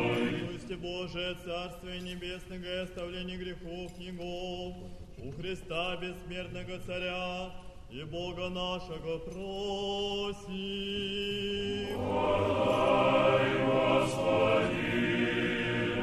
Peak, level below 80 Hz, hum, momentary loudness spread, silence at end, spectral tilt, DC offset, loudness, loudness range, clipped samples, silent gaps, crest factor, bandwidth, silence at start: -14 dBFS; -50 dBFS; none; 15 LU; 0 s; -5.5 dB/octave; under 0.1%; -32 LUFS; 12 LU; under 0.1%; none; 18 dB; 13.5 kHz; 0 s